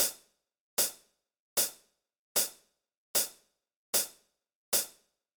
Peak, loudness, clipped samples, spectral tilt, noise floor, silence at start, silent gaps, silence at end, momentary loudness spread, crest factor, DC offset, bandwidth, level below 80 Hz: -14 dBFS; -31 LUFS; under 0.1%; 1 dB/octave; -65 dBFS; 0 s; 0.61-0.77 s, 1.40-1.56 s, 2.19-2.35 s, 2.97-3.14 s, 3.76-3.93 s, 4.55-4.72 s; 0.45 s; 6 LU; 22 dB; under 0.1%; over 20 kHz; -72 dBFS